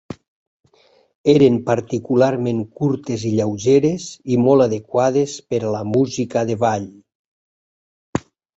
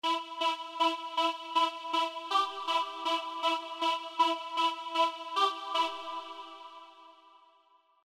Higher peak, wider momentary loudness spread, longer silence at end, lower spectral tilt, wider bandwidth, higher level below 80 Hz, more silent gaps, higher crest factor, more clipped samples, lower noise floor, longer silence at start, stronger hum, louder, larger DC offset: first, -2 dBFS vs -14 dBFS; first, 14 LU vs 11 LU; second, 0.35 s vs 0.75 s; first, -6.5 dB/octave vs 0.5 dB/octave; second, 8 kHz vs 15 kHz; first, -54 dBFS vs under -90 dBFS; first, 0.28-0.60 s, 1.15-1.24 s, 7.15-8.13 s vs none; about the same, 18 dB vs 18 dB; neither; second, -56 dBFS vs -66 dBFS; about the same, 0.1 s vs 0.05 s; neither; first, -18 LUFS vs -31 LUFS; neither